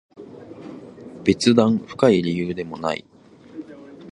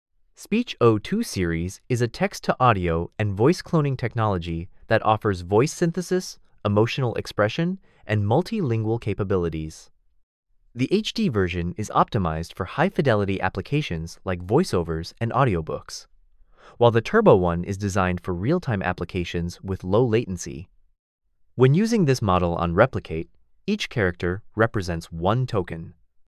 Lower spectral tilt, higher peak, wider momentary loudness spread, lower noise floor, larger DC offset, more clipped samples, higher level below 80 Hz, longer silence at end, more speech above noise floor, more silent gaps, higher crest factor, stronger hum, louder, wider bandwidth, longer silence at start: about the same, -6 dB/octave vs -6.5 dB/octave; about the same, -2 dBFS vs -2 dBFS; first, 24 LU vs 11 LU; second, -40 dBFS vs -54 dBFS; neither; neither; second, -54 dBFS vs -42 dBFS; second, 0.05 s vs 0.45 s; second, 21 dB vs 32 dB; second, none vs 10.23-10.43 s, 20.99-21.19 s; about the same, 22 dB vs 20 dB; neither; first, -20 LUFS vs -23 LUFS; second, 11 kHz vs 14 kHz; second, 0.2 s vs 0.4 s